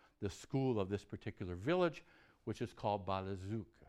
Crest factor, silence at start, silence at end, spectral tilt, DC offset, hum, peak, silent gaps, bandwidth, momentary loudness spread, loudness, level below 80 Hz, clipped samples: 18 dB; 0.2 s; 0.25 s; -7 dB/octave; under 0.1%; none; -22 dBFS; none; 12.5 kHz; 11 LU; -40 LUFS; -66 dBFS; under 0.1%